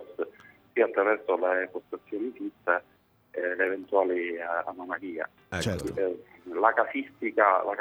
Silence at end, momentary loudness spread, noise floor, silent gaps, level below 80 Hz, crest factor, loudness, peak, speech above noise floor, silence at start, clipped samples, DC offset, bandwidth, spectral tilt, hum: 0 s; 13 LU; -53 dBFS; none; -62 dBFS; 22 dB; -29 LUFS; -6 dBFS; 25 dB; 0 s; under 0.1%; under 0.1%; 15.5 kHz; -5.5 dB/octave; none